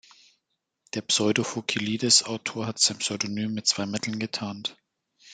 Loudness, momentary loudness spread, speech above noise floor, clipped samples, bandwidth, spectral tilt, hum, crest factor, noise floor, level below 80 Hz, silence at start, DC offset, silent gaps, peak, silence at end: -25 LUFS; 13 LU; 53 dB; under 0.1%; 10 kHz; -2.5 dB/octave; none; 22 dB; -80 dBFS; -70 dBFS; 0.95 s; under 0.1%; none; -6 dBFS; 0 s